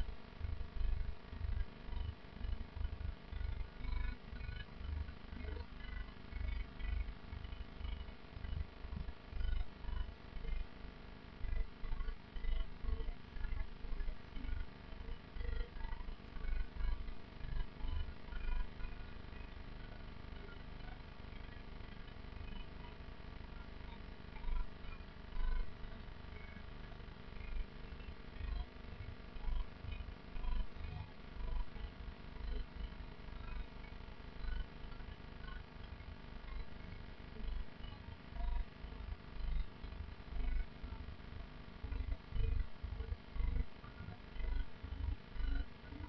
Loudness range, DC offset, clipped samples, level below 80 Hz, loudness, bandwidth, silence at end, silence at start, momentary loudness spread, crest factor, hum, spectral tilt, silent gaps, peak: 5 LU; under 0.1%; under 0.1%; -44 dBFS; -49 LUFS; 5.6 kHz; 0 s; 0 s; 8 LU; 16 dB; none; -5.5 dB/octave; none; -26 dBFS